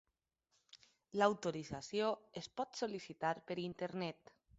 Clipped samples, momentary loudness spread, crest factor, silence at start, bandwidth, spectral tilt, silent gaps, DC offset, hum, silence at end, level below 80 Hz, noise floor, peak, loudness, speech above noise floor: under 0.1%; 11 LU; 24 dB; 0.75 s; 8 kHz; -4 dB/octave; none; under 0.1%; none; 0.45 s; -74 dBFS; -85 dBFS; -18 dBFS; -41 LUFS; 45 dB